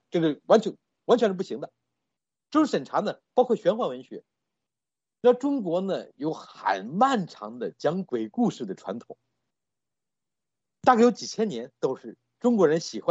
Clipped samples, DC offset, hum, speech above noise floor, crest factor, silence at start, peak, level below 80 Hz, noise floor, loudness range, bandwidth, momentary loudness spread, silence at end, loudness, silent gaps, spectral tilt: under 0.1%; under 0.1%; none; over 65 dB; 22 dB; 0.15 s; -6 dBFS; -76 dBFS; under -90 dBFS; 3 LU; 8 kHz; 15 LU; 0 s; -26 LUFS; none; -6 dB/octave